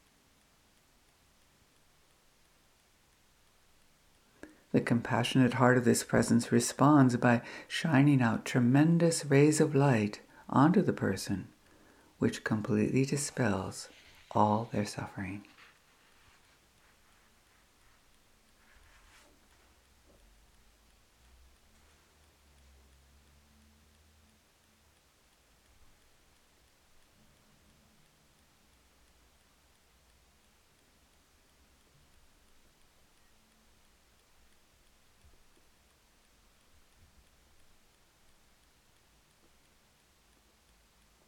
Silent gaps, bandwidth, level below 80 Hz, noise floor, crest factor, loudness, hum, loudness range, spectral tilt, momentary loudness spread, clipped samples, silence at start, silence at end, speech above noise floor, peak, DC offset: none; 15.5 kHz; -66 dBFS; -67 dBFS; 26 dB; -29 LUFS; none; 10 LU; -6 dB/octave; 14 LU; under 0.1%; 4.75 s; 25.85 s; 39 dB; -8 dBFS; under 0.1%